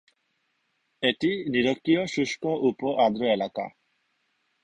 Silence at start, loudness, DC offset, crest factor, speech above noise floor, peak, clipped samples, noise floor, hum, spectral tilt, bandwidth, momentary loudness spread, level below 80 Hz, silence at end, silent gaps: 1 s; -25 LUFS; under 0.1%; 20 dB; 49 dB; -8 dBFS; under 0.1%; -74 dBFS; none; -5 dB/octave; 9.8 kHz; 5 LU; -66 dBFS; 0.95 s; none